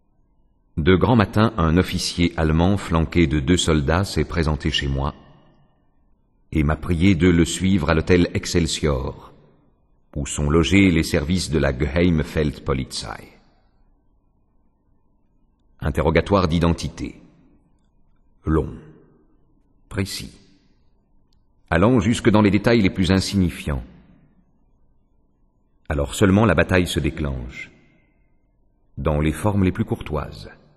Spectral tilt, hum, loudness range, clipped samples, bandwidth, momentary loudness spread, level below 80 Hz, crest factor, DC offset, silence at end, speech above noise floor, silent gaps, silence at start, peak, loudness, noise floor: -6 dB/octave; none; 10 LU; under 0.1%; 12.5 kHz; 15 LU; -34 dBFS; 20 dB; under 0.1%; 0.25 s; 41 dB; none; 0.75 s; 0 dBFS; -20 LUFS; -61 dBFS